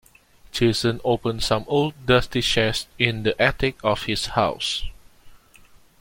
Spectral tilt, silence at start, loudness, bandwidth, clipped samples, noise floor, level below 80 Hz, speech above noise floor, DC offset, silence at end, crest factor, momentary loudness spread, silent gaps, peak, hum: -4.5 dB/octave; 0.55 s; -22 LUFS; 16.5 kHz; under 0.1%; -52 dBFS; -40 dBFS; 30 dB; under 0.1%; 0.65 s; 22 dB; 5 LU; none; -2 dBFS; none